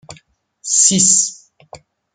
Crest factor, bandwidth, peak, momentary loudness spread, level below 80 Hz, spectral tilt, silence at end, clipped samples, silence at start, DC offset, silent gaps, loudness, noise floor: 18 dB; 10.5 kHz; 0 dBFS; 13 LU; -60 dBFS; -1.5 dB/octave; 0.4 s; under 0.1%; 0.1 s; under 0.1%; none; -11 LUFS; -51 dBFS